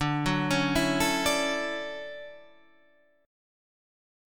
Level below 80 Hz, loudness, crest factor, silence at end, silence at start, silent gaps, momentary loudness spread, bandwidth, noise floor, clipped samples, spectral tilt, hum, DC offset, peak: -50 dBFS; -27 LUFS; 20 dB; 1 s; 0 s; none; 16 LU; 19.5 kHz; -64 dBFS; under 0.1%; -4 dB/octave; none; 0.3%; -10 dBFS